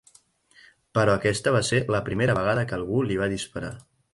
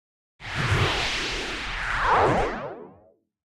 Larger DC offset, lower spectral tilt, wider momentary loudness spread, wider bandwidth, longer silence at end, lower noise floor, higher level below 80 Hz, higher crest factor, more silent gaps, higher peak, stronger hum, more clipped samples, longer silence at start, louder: neither; about the same, -5.5 dB/octave vs -4.5 dB/octave; second, 11 LU vs 15 LU; second, 11.5 kHz vs 14.5 kHz; second, 0.35 s vs 0.65 s; about the same, -59 dBFS vs -58 dBFS; second, -50 dBFS vs -40 dBFS; about the same, 18 dB vs 18 dB; neither; about the same, -8 dBFS vs -10 dBFS; neither; neither; first, 0.95 s vs 0.4 s; about the same, -24 LUFS vs -24 LUFS